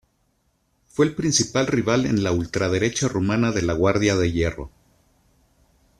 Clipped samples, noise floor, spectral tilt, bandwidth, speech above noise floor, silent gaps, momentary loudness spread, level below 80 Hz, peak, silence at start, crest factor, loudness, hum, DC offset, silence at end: under 0.1%; -68 dBFS; -5 dB/octave; 13 kHz; 47 dB; none; 5 LU; -46 dBFS; -4 dBFS; 1 s; 18 dB; -21 LUFS; none; under 0.1%; 1.3 s